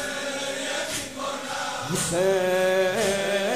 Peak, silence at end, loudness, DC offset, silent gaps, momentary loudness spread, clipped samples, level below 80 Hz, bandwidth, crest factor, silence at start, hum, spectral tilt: -12 dBFS; 0 s; -25 LUFS; 0.2%; none; 7 LU; under 0.1%; -56 dBFS; 15.5 kHz; 14 dB; 0 s; none; -3 dB/octave